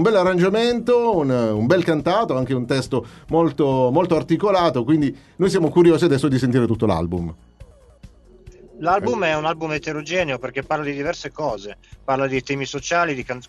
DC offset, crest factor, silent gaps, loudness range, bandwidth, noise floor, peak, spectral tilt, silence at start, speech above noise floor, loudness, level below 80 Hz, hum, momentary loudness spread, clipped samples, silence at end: under 0.1%; 18 dB; none; 6 LU; 12 kHz; -46 dBFS; -2 dBFS; -6.5 dB/octave; 0 s; 27 dB; -20 LUFS; -46 dBFS; none; 9 LU; under 0.1%; 0.05 s